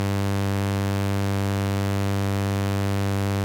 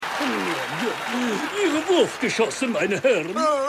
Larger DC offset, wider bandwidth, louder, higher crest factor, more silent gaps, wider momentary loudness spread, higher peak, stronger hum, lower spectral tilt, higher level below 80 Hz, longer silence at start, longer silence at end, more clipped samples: neither; about the same, 17 kHz vs 16 kHz; about the same, -25 LUFS vs -23 LUFS; about the same, 12 dB vs 16 dB; neither; second, 0 LU vs 5 LU; second, -12 dBFS vs -8 dBFS; neither; first, -6.5 dB/octave vs -3.5 dB/octave; first, -56 dBFS vs -66 dBFS; about the same, 0 s vs 0 s; about the same, 0 s vs 0 s; neither